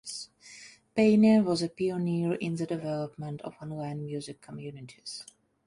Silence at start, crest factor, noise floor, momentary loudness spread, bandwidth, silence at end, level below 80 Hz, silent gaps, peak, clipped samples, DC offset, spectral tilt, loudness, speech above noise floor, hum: 0.05 s; 18 dB; -52 dBFS; 21 LU; 11.5 kHz; 0.45 s; -68 dBFS; none; -12 dBFS; under 0.1%; under 0.1%; -6.5 dB/octave; -28 LUFS; 23 dB; none